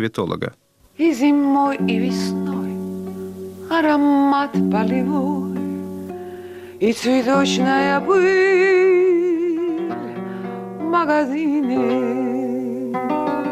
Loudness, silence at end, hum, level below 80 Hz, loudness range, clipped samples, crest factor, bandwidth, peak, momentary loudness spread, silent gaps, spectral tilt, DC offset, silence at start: -19 LUFS; 0 s; none; -62 dBFS; 4 LU; under 0.1%; 10 dB; 14.5 kHz; -8 dBFS; 15 LU; none; -6 dB/octave; under 0.1%; 0 s